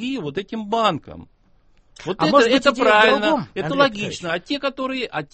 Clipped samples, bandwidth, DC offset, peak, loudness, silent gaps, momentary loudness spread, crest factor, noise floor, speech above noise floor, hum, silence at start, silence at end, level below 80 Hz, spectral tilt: under 0.1%; 8.8 kHz; under 0.1%; -2 dBFS; -19 LUFS; none; 13 LU; 18 dB; -55 dBFS; 36 dB; none; 0 s; 0.1 s; -54 dBFS; -4.5 dB/octave